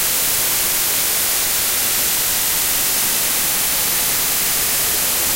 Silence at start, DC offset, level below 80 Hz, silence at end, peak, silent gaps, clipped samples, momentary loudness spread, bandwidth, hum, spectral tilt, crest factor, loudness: 0 s; under 0.1%; -42 dBFS; 0 s; -4 dBFS; none; under 0.1%; 0 LU; 16.5 kHz; none; 0.5 dB/octave; 14 dB; -15 LUFS